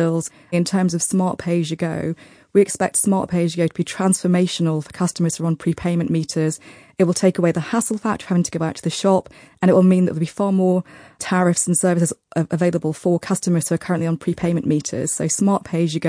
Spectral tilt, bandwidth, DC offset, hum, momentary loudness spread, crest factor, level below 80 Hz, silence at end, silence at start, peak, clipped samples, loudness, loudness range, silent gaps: -5.5 dB/octave; 10.5 kHz; under 0.1%; none; 6 LU; 16 dB; -56 dBFS; 0 s; 0 s; -2 dBFS; under 0.1%; -20 LUFS; 2 LU; none